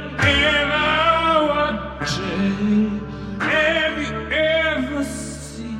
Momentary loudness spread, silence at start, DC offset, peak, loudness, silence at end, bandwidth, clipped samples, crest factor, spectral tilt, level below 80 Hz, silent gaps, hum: 11 LU; 0 s; under 0.1%; -4 dBFS; -19 LUFS; 0 s; 13 kHz; under 0.1%; 16 dB; -4.5 dB/octave; -38 dBFS; none; none